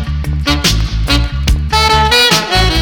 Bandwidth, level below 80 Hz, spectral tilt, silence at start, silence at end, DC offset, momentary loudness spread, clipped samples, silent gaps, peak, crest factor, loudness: over 20 kHz; -16 dBFS; -3.5 dB/octave; 0 s; 0 s; under 0.1%; 8 LU; under 0.1%; none; -2 dBFS; 10 dB; -11 LUFS